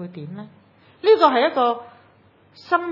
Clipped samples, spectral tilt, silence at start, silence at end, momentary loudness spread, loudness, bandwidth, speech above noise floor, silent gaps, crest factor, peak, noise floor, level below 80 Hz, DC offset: under 0.1%; -6.5 dB/octave; 0 s; 0 s; 21 LU; -18 LUFS; 6 kHz; 35 dB; none; 22 dB; 0 dBFS; -55 dBFS; -78 dBFS; under 0.1%